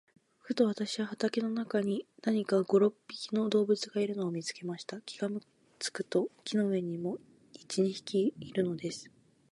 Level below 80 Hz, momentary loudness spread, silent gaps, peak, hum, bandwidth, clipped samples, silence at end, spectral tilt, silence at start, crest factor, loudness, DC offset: -78 dBFS; 11 LU; none; -14 dBFS; none; 11.5 kHz; under 0.1%; 0.45 s; -5.5 dB/octave; 0.45 s; 18 dB; -33 LUFS; under 0.1%